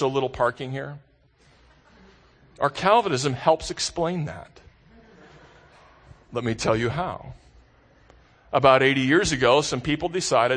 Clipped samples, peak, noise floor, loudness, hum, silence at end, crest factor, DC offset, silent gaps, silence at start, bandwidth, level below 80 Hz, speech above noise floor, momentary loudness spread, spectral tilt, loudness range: under 0.1%; -2 dBFS; -58 dBFS; -23 LUFS; none; 0 s; 22 dB; under 0.1%; none; 0 s; 9.8 kHz; -50 dBFS; 36 dB; 15 LU; -4.5 dB/octave; 8 LU